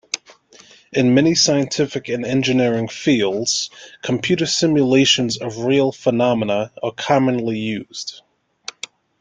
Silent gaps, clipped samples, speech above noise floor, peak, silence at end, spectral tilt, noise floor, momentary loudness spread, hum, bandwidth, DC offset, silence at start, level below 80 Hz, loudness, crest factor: none; under 0.1%; 30 dB; -2 dBFS; 1.05 s; -4 dB/octave; -48 dBFS; 15 LU; none; 9.4 kHz; under 0.1%; 0.15 s; -58 dBFS; -18 LUFS; 18 dB